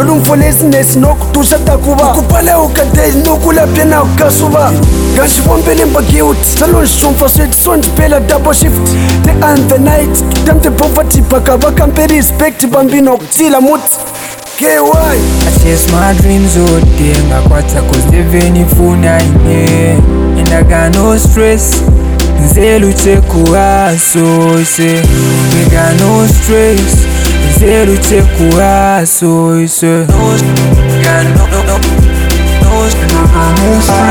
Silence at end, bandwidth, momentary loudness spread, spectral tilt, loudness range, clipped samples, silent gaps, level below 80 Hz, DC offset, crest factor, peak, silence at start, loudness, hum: 0 s; 19.5 kHz; 2 LU; -5 dB/octave; 1 LU; 1%; none; -12 dBFS; under 0.1%; 6 dB; 0 dBFS; 0 s; -7 LUFS; none